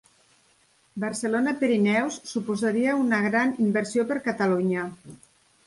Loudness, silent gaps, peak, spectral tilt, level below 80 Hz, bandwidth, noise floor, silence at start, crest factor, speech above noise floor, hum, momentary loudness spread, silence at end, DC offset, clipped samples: -25 LUFS; none; -10 dBFS; -5.5 dB/octave; -68 dBFS; 11.5 kHz; -63 dBFS; 0.95 s; 16 dB; 39 dB; none; 9 LU; 0.5 s; under 0.1%; under 0.1%